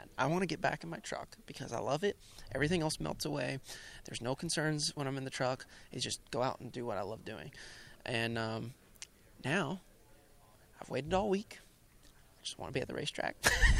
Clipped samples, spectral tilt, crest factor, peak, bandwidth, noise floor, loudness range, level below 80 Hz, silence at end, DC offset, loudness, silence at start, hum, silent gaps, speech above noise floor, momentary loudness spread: under 0.1%; -4 dB/octave; 26 dB; -10 dBFS; 16 kHz; -62 dBFS; 4 LU; -46 dBFS; 0 s; under 0.1%; -37 LUFS; 0 s; none; none; 26 dB; 16 LU